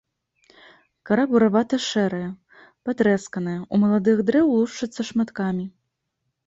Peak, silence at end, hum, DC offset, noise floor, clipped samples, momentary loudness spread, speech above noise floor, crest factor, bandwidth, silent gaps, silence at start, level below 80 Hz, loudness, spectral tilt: -6 dBFS; 0.75 s; none; under 0.1%; -77 dBFS; under 0.1%; 12 LU; 57 dB; 16 dB; 7.8 kHz; none; 1.05 s; -62 dBFS; -22 LUFS; -6 dB/octave